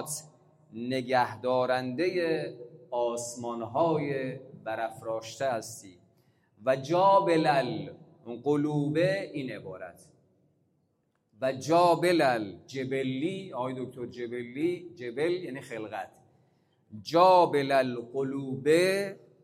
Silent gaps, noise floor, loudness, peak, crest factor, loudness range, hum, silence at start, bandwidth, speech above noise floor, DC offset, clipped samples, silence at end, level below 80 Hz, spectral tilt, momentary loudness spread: none; -74 dBFS; -29 LUFS; -8 dBFS; 20 dB; 6 LU; none; 0 s; 16 kHz; 46 dB; under 0.1%; under 0.1%; 0.25 s; -76 dBFS; -5.5 dB/octave; 16 LU